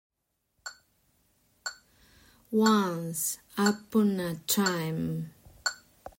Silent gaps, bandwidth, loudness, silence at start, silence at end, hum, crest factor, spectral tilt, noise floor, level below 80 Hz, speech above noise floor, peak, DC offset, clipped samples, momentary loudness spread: none; 16.5 kHz; -29 LUFS; 0.65 s; 0.1 s; none; 20 dB; -4 dB/octave; -78 dBFS; -66 dBFS; 50 dB; -12 dBFS; under 0.1%; under 0.1%; 20 LU